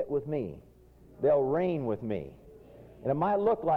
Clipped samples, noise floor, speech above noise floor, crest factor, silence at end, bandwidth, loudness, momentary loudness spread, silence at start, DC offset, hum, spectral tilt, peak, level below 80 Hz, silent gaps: under 0.1%; -55 dBFS; 26 dB; 14 dB; 0 s; 4.8 kHz; -30 LUFS; 13 LU; 0 s; under 0.1%; none; -10 dB/octave; -16 dBFS; -60 dBFS; none